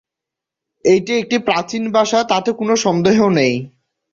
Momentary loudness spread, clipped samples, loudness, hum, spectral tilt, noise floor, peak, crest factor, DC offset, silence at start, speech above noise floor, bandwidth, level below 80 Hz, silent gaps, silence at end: 5 LU; under 0.1%; -16 LUFS; none; -5 dB/octave; -84 dBFS; 0 dBFS; 16 dB; under 0.1%; 0.85 s; 69 dB; 7.8 kHz; -56 dBFS; none; 0.45 s